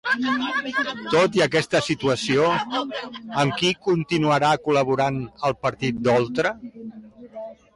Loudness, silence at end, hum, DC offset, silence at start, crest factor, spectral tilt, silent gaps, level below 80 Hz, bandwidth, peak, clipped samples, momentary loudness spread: -22 LUFS; 0.2 s; none; under 0.1%; 0.05 s; 14 dB; -5 dB/octave; none; -56 dBFS; 11.5 kHz; -10 dBFS; under 0.1%; 16 LU